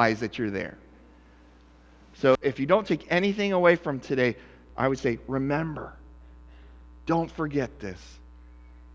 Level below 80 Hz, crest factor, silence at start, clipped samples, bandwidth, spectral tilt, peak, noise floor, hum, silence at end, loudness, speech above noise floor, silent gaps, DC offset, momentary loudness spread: -50 dBFS; 22 dB; 0 s; under 0.1%; 7.8 kHz; -6.5 dB/octave; -6 dBFS; -54 dBFS; none; 0 s; -26 LUFS; 28 dB; none; under 0.1%; 17 LU